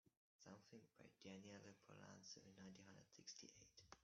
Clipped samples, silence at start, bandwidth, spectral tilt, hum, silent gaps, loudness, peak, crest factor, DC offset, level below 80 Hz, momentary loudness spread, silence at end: under 0.1%; 0.05 s; 7.2 kHz; -4 dB/octave; none; 0.17-0.39 s; -63 LUFS; -42 dBFS; 24 dB; under 0.1%; under -90 dBFS; 7 LU; 0 s